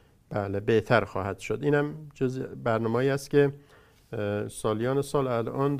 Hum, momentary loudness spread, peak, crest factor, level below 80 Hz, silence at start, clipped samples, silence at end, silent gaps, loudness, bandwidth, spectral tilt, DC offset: none; 9 LU; -6 dBFS; 22 dB; -56 dBFS; 0.3 s; under 0.1%; 0 s; none; -28 LUFS; 15.5 kHz; -6.5 dB/octave; under 0.1%